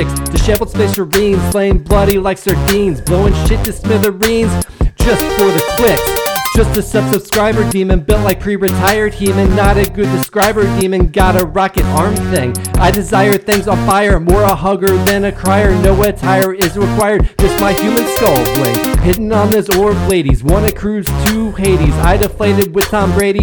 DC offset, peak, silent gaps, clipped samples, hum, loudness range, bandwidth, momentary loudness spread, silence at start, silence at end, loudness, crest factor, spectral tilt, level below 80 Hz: under 0.1%; 0 dBFS; none; 0.1%; none; 1 LU; 20 kHz; 4 LU; 0 s; 0 s; -12 LUFS; 12 dB; -5.5 dB/octave; -20 dBFS